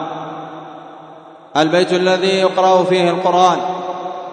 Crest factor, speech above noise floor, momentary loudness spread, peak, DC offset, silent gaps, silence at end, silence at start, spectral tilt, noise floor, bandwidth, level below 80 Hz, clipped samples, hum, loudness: 16 dB; 25 dB; 18 LU; 0 dBFS; under 0.1%; none; 0 s; 0 s; -5 dB/octave; -39 dBFS; 9.6 kHz; -70 dBFS; under 0.1%; none; -15 LUFS